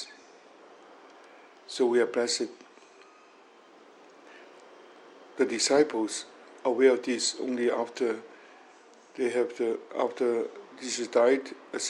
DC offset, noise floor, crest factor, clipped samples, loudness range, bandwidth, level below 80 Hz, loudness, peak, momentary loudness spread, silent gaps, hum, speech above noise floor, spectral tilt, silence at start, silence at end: under 0.1%; -56 dBFS; 20 dB; under 0.1%; 5 LU; 11.5 kHz; -88 dBFS; -28 LUFS; -10 dBFS; 15 LU; none; none; 28 dB; -2 dB/octave; 0 s; 0 s